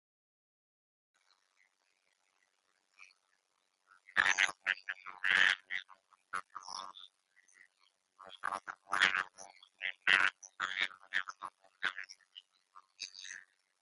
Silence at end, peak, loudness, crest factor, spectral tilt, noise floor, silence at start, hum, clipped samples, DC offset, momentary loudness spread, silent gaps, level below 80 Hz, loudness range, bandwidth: 0.4 s; -12 dBFS; -34 LUFS; 28 dB; 1 dB/octave; -80 dBFS; 3 s; none; under 0.1%; under 0.1%; 22 LU; none; -80 dBFS; 8 LU; 11.5 kHz